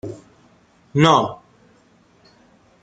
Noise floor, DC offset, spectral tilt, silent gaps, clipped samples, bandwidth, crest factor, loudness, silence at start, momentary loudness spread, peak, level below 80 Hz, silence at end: -55 dBFS; under 0.1%; -5.5 dB/octave; none; under 0.1%; 9.2 kHz; 22 dB; -17 LUFS; 0.05 s; 27 LU; -2 dBFS; -58 dBFS; 1.5 s